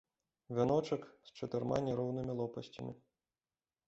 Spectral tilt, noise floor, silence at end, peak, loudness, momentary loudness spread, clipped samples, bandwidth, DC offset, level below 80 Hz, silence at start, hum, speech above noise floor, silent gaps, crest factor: -7 dB/octave; under -90 dBFS; 0.9 s; -20 dBFS; -38 LUFS; 15 LU; under 0.1%; 8 kHz; under 0.1%; -68 dBFS; 0.5 s; none; over 53 dB; none; 20 dB